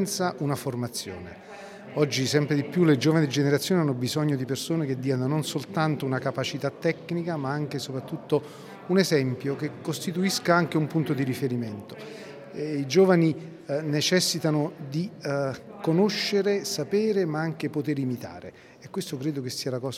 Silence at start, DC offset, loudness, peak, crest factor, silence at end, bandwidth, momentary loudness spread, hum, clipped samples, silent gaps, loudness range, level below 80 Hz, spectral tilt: 0 s; under 0.1%; -26 LUFS; -6 dBFS; 20 dB; 0 s; 16 kHz; 13 LU; none; under 0.1%; none; 4 LU; -72 dBFS; -5.5 dB/octave